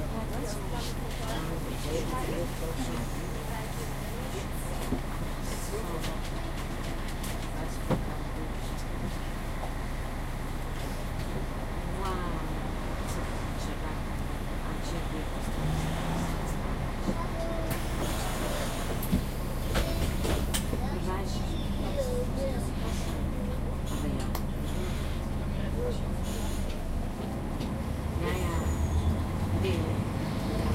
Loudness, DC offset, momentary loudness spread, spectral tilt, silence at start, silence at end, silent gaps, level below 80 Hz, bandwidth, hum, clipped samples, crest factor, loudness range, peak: -33 LUFS; under 0.1%; 6 LU; -5.5 dB/octave; 0 s; 0 s; none; -34 dBFS; 16 kHz; none; under 0.1%; 16 dB; 4 LU; -14 dBFS